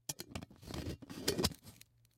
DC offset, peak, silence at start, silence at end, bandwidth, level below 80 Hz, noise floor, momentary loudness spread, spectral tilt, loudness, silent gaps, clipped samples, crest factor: under 0.1%; -16 dBFS; 0.1 s; 0.4 s; 16.5 kHz; -58 dBFS; -61 dBFS; 20 LU; -3.5 dB/octave; -41 LUFS; none; under 0.1%; 26 dB